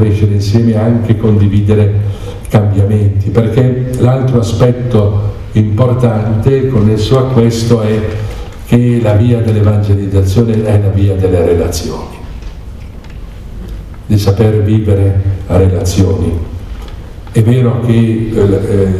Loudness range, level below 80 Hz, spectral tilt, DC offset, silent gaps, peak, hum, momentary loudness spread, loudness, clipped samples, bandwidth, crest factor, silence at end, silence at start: 4 LU; -28 dBFS; -8 dB/octave; 0.4%; none; 0 dBFS; none; 17 LU; -11 LUFS; 0.3%; 13 kHz; 10 dB; 0 s; 0 s